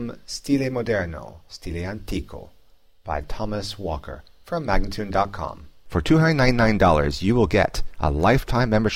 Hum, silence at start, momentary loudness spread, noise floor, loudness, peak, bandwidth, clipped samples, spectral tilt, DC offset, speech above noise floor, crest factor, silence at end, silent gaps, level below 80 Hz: none; 0 s; 16 LU; -58 dBFS; -23 LUFS; -6 dBFS; 16 kHz; under 0.1%; -6.5 dB/octave; 0.6%; 36 dB; 16 dB; 0 s; none; -32 dBFS